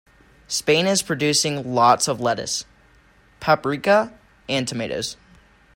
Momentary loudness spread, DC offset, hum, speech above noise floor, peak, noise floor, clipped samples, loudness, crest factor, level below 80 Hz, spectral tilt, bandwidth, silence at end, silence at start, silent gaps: 11 LU; under 0.1%; none; 34 dB; -2 dBFS; -54 dBFS; under 0.1%; -21 LUFS; 20 dB; -56 dBFS; -3 dB/octave; 16.5 kHz; 0.6 s; 0.5 s; none